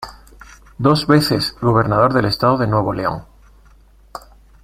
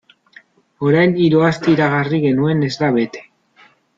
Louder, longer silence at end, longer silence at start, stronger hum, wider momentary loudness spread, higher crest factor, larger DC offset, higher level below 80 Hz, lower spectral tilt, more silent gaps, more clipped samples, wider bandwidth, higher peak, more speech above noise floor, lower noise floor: about the same, -16 LUFS vs -16 LUFS; second, 0.45 s vs 0.75 s; second, 0 s vs 0.8 s; neither; first, 23 LU vs 7 LU; about the same, 18 dB vs 14 dB; neither; first, -42 dBFS vs -56 dBFS; about the same, -6.5 dB/octave vs -7.5 dB/octave; neither; neither; first, 16 kHz vs 7.6 kHz; about the same, 0 dBFS vs -2 dBFS; second, 32 dB vs 37 dB; about the same, -48 dBFS vs -51 dBFS